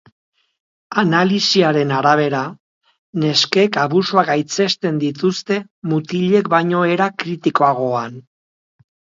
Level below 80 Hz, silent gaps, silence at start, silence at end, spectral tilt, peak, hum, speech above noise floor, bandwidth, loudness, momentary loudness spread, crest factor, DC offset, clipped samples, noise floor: -64 dBFS; 2.60-2.81 s, 2.98-3.13 s, 5.71-5.82 s; 0.9 s; 1 s; -5 dB/octave; 0 dBFS; none; over 74 dB; 7.6 kHz; -17 LUFS; 8 LU; 18 dB; under 0.1%; under 0.1%; under -90 dBFS